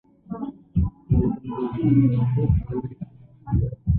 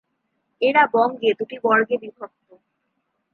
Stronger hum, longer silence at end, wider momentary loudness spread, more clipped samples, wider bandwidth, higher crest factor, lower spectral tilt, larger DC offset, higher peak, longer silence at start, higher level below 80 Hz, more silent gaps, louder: neither; second, 0 s vs 1.05 s; second, 18 LU vs 21 LU; neither; second, 3.6 kHz vs 6.2 kHz; about the same, 16 dB vs 20 dB; first, -14 dB/octave vs -6.5 dB/octave; neither; second, -8 dBFS vs -4 dBFS; second, 0.3 s vs 0.6 s; first, -32 dBFS vs -78 dBFS; neither; second, -24 LUFS vs -19 LUFS